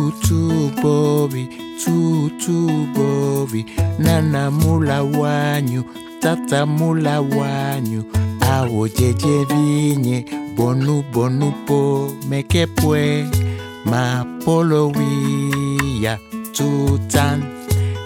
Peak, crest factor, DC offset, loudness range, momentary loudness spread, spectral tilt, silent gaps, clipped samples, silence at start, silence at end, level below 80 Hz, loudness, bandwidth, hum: -2 dBFS; 16 dB; under 0.1%; 1 LU; 6 LU; -6 dB/octave; none; under 0.1%; 0 s; 0 s; -40 dBFS; -18 LUFS; 17.5 kHz; none